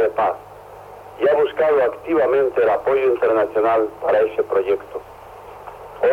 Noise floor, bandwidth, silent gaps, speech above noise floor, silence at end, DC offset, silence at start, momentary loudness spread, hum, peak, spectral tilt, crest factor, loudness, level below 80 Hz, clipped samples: -39 dBFS; 13.5 kHz; none; 22 dB; 0 s; under 0.1%; 0 s; 22 LU; none; -8 dBFS; -6.5 dB/octave; 12 dB; -18 LUFS; -54 dBFS; under 0.1%